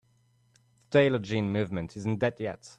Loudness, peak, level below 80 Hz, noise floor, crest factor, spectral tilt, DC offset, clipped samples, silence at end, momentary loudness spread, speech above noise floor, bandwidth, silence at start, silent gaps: -28 LUFS; -10 dBFS; -62 dBFS; -67 dBFS; 20 dB; -7 dB/octave; under 0.1%; under 0.1%; 0.05 s; 10 LU; 39 dB; 10 kHz; 0.9 s; none